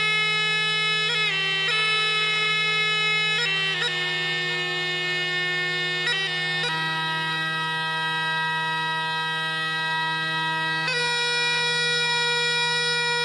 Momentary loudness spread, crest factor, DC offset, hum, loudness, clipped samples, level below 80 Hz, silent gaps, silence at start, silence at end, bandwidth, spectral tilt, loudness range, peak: 4 LU; 14 dB; under 0.1%; none; -22 LUFS; under 0.1%; -70 dBFS; none; 0 s; 0 s; 13 kHz; -2 dB/octave; 4 LU; -10 dBFS